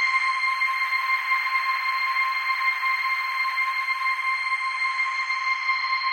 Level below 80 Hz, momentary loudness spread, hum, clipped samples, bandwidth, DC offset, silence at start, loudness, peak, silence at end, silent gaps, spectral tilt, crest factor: under -90 dBFS; 2 LU; none; under 0.1%; 16 kHz; under 0.1%; 0 s; -23 LUFS; -12 dBFS; 0 s; none; 7 dB/octave; 14 dB